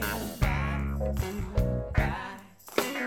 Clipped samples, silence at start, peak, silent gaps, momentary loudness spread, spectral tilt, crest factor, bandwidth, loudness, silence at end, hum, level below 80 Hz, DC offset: under 0.1%; 0 s; -8 dBFS; none; 6 LU; -5.5 dB/octave; 22 dB; 19.5 kHz; -31 LUFS; 0 s; none; -34 dBFS; under 0.1%